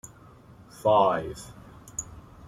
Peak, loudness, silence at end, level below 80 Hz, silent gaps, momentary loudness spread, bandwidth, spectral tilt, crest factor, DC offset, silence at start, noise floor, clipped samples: -8 dBFS; -26 LUFS; 0.25 s; -54 dBFS; none; 25 LU; 15 kHz; -4.5 dB/octave; 22 dB; under 0.1%; 0.8 s; -51 dBFS; under 0.1%